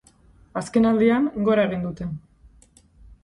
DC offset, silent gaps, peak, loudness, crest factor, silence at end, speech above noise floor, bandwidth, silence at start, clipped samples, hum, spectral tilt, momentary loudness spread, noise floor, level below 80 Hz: under 0.1%; none; -6 dBFS; -22 LUFS; 16 dB; 0.1 s; 34 dB; 11 kHz; 0.55 s; under 0.1%; none; -7 dB/octave; 15 LU; -55 dBFS; -50 dBFS